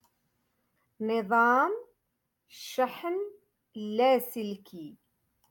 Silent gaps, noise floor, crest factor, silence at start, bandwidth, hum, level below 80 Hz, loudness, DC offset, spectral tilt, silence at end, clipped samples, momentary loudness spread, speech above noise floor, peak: none; -81 dBFS; 18 dB; 1 s; 17.5 kHz; none; -80 dBFS; -28 LUFS; under 0.1%; -4.5 dB/octave; 0.55 s; under 0.1%; 22 LU; 52 dB; -14 dBFS